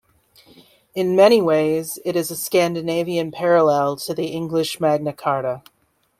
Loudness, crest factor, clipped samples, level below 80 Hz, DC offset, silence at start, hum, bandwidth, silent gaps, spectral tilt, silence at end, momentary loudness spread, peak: -19 LUFS; 18 dB; under 0.1%; -62 dBFS; under 0.1%; 0.95 s; none; 16 kHz; none; -5 dB/octave; 0.6 s; 11 LU; -2 dBFS